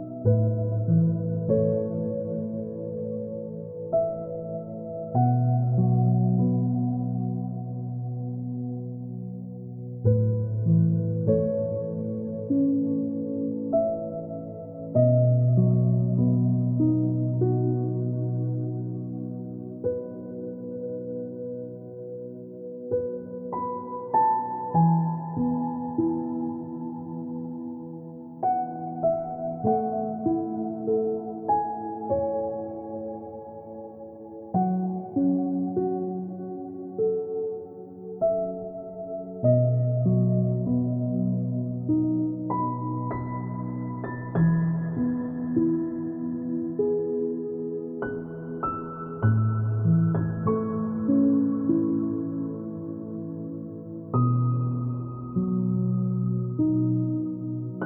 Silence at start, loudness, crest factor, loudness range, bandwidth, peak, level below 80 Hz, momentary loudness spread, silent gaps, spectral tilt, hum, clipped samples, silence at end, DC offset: 0 s; -27 LUFS; 16 dB; 7 LU; 2.1 kHz; -10 dBFS; -58 dBFS; 13 LU; none; -15.5 dB/octave; none; under 0.1%; 0 s; under 0.1%